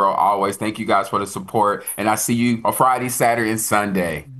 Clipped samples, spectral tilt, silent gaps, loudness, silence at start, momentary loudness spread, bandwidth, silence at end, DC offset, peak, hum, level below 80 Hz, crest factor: under 0.1%; -4.5 dB/octave; none; -19 LUFS; 0 s; 6 LU; 13 kHz; 0 s; under 0.1%; -2 dBFS; none; -56 dBFS; 18 dB